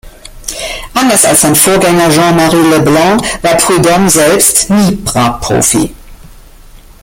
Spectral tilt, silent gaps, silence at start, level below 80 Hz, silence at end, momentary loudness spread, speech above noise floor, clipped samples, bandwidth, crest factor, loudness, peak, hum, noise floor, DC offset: -3.5 dB/octave; none; 0.05 s; -32 dBFS; 0.25 s; 11 LU; 27 dB; 0.4%; over 20 kHz; 10 dB; -7 LUFS; 0 dBFS; none; -34 dBFS; under 0.1%